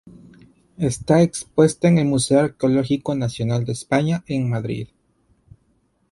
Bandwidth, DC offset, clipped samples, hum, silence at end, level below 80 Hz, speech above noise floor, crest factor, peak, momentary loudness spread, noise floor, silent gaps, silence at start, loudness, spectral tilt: 11.5 kHz; under 0.1%; under 0.1%; none; 1.25 s; -52 dBFS; 45 dB; 18 dB; -2 dBFS; 9 LU; -64 dBFS; none; 0.8 s; -20 LUFS; -6.5 dB/octave